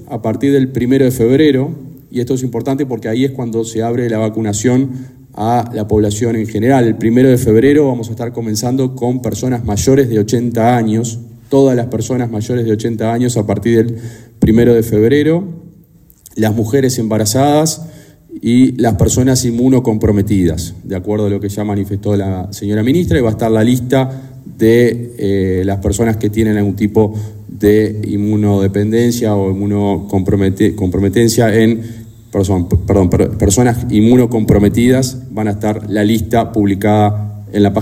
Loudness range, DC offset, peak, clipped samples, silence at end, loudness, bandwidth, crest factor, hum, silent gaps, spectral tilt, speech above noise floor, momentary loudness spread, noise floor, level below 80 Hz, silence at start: 3 LU; under 0.1%; 0 dBFS; under 0.1%; 0 s; -13 LUFS; 16 kHz; 12 dB; none; none; -6.5 dB/octave; 32 dB; 9 LU; -44 dBFS; -36 dBFS; 0 s